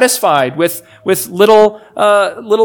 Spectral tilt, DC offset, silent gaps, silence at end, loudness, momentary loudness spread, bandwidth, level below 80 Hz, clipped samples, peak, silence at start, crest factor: -3.5 dB/octave; under 0.1%; none; 0 s; -12 LUFS; 9 LU; 19.5 kHz; -58 dBFS; 0.8%; 0 dBFS; 0 s; 12 dB